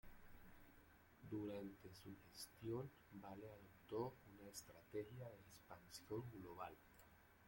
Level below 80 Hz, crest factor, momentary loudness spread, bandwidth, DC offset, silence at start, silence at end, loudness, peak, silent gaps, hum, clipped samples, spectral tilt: -74 dBFS; 20 dB; 17 LU; 16.5 kHz; under 0.1%; 0.05 s; 0 s; -55 LUFS; -34 dBFS; none; none; under 0.1%; -5.5 dB/octave